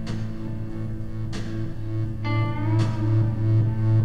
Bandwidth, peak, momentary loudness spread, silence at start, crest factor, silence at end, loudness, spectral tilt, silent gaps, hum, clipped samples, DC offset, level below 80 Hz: 7 kHz; -12 dBFS; 10 LU; 0 s; 12 dB; 0 s; -26 LUFS; -8.5 dB/octave; none; none; under 0.1%; under 0.1%; -38 dBFS